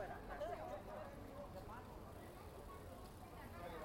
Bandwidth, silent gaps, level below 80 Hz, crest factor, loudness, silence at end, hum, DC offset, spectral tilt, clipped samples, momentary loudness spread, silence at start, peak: 16.5 kHz; none; -62 dBFS; 16 dB; -53 LUFS; 0 s; none; under 0.1%; -6 dB/octave; under 0.1%; 8 LU; 0 s; -36 dBFS